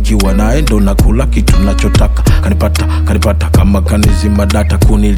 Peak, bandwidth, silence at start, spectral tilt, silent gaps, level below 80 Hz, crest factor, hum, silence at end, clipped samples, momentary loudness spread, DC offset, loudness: 0 dBFS; 16 kHz; 0 s; -6.5 dB/octave; none; -10 dBFS; 8 dB; none; 0 s; under 0.1%; 2 LU; under 0.1%; -11 LUFS